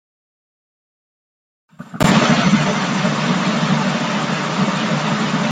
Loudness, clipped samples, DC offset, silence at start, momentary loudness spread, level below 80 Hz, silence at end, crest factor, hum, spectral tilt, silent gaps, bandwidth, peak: -17 LUFS; under 0.1%; under 0.1%; 1.8 s; 6 LU; -48 dBFS; 0 s; 16 dB; none; -5 dB/octave; none; 15.5 kHz; -2 dBFS